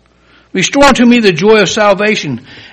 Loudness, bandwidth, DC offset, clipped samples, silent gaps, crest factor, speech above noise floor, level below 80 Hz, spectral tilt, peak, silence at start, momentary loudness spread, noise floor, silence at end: -8 LUFS; 11.5 kHz; under 0.1%; 0.7%; none; 10 dB; 38 dB; -38 dBFS; -4 dB/octave; 0 dBFS; 0.55 s; 13 LU; -46 dBFS; 0.1 s